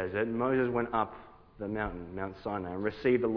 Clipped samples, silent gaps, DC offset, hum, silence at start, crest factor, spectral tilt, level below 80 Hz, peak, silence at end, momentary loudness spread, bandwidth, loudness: under 0.1%; none; under 0.1%; none; 0 s; 18 dB; -6 dB/octave; -54 dBFS; -14 dBFS; 0 s; 10 LU; 5.4 kHz; -33 LUFS